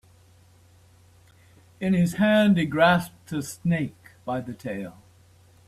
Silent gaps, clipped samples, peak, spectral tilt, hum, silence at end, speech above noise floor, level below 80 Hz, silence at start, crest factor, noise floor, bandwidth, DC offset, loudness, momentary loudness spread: none; under 0.1%; -8 dBFS; -6.5 dB/octave; none; 0.75 s; 32 dB; -58 dBFS; 1.8 s; 18 dB; -55 dBFS; 14 kHz; under 0.1%; -24 LUFS; 14 LU